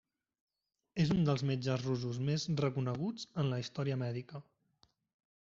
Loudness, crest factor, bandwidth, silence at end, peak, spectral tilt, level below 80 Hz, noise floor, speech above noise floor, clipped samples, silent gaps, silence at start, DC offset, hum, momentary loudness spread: -36 LUFS; 18 dB; 7.6 kHz; 1.1 s; -18 dBFS; -6.5 dB/octave; -66 dBFS; -74 dBFS; 39 dB; under 0.1%; none; 0.95 s; under 0.1%; none; 10 LU